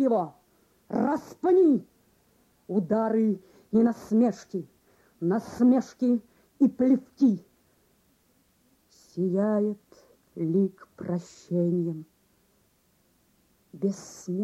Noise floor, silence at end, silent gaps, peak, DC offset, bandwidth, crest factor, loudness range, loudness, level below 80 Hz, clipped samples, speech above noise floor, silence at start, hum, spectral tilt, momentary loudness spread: -67 dBFS; 0 s; none; -12 dBFS; under 0.1%; 12.5 kHz; 16 dB; 6 LU; -26 LUFS; -70 dBFS; under 0.1%; 42 dB; 0 s; none; -8.5 dB/octave; 14 LU